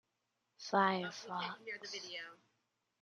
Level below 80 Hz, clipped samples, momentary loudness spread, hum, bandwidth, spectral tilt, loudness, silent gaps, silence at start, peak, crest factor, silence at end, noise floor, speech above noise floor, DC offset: under -90 dBFS; under 0.1%; 15 LU; none; 9.8 kHz; -4 dB/octave; -39 LUFS; none; 0.6 s; -18 dBFS; 24 dB; 0.65 s; -85 dBFS; 46 dB; under 0.1%